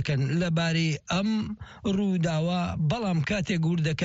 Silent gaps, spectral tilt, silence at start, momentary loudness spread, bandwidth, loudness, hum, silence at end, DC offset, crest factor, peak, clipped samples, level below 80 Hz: none; -6 dB/octave; 0 s; 4 LU; 8 kHz; -27 LUFS; none; 0 s; under 0.1%; 12 dB; -14 dBFS; under 0.1%; -50 dBFS